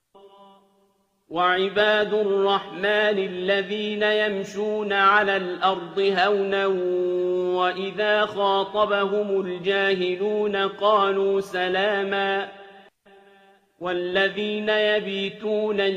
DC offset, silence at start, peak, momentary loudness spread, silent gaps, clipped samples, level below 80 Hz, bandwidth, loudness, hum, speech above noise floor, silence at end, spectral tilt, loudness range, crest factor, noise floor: under 0.1%; 0.25 s; -6 dBFS; 6 LU; none; under 0.1%; -68 dBFS; 9.6 kHz; -22 LUFS; none; 43 dB; 0 s; -5 dB/octave; 4 LU; 18 dB; -66 dBFS